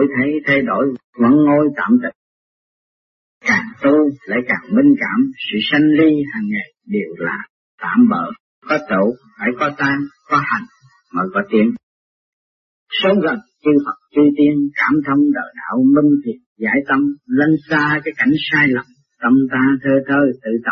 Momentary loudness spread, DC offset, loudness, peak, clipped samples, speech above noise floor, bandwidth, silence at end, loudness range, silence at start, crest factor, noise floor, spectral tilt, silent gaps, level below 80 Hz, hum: 10 LU; under 0.1%; -16 LUFS; -2 dBFS; under 0.1%; over 75 dB; 6.4 kHz; 0 s; 4 LU; 0 s; 14 dB; under -90 dBFS; -7 dB/octave; 1.04-1.13 s, 2.15-3.41 s, 7.50-7.78 s, 8.40-8.62 s, 11.83-12.86 s, 16.46-16.56 s; -58 dBFS; none